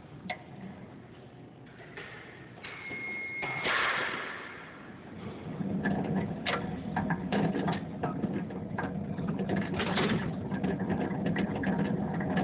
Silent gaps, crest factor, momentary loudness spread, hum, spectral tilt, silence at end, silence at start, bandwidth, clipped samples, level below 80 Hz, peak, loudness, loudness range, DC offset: none; 16 dB; 17 LU; none; -5 dB/octave; 0 s; 0 s; 4 kHz; under 0.1%; -54 dBFS; -16 dBFS; -33 LUFS; 3 LU; under 0.1%